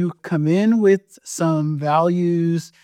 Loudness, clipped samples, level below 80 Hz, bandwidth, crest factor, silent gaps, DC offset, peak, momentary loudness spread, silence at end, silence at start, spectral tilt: -19 LUFS; under 0.1%; -72 dBFS; 14 kHz; 14 dB; none; under 0.1%; -6 dBFS; 7 LU; 0.15 s; 0 s; -7 dB/octave